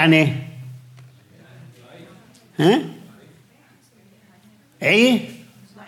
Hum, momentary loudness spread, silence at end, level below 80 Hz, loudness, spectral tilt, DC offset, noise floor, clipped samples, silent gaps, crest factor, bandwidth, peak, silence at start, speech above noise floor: none; 25 LU; 0.5 s; -72 dBFS; -18 LUFS; -5.5 dB/octave; under 0.1%; -55 dBFS; under 0.1%; none; 18 dB; 16.5 kHz; -4 dBFS; 0 s; 38 dB